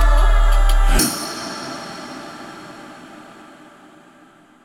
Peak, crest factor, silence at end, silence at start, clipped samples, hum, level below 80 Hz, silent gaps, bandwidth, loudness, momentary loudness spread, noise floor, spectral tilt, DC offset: -4 dBFS; 14 dB; 1.7 s; 0 s; under 0.1%; none; -18 dBFS; none; 16.5 kHz; -20 LUFS; 23 LU; -49 dBFS; -3.5 dB/octave; under 0.1%